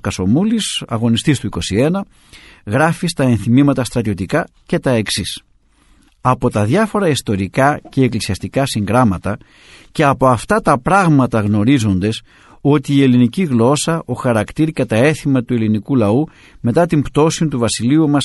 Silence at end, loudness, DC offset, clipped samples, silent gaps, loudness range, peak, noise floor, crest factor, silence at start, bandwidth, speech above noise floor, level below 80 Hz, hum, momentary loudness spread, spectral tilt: 0 s; -15 LUFS; under 0.1%; under 0.1%; none; 3 LU; 0 dBFS; -52 dBFS; 16 dB; 0.05 s; 12 kHz; 37 dB; -42 dBFS; none; 8 LU; -6 dB/octave